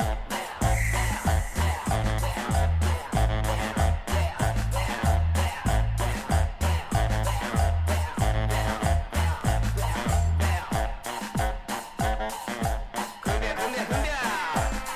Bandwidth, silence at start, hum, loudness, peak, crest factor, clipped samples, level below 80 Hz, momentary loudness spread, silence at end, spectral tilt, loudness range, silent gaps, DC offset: 16 kHz; 0 s; none; -27 LUFS; -10 dBFS; 16 dB; under 0.1%; -28 dBFS; 5 LU; 0 s; -5 dB/octave; 3 LU; none; under 0.1%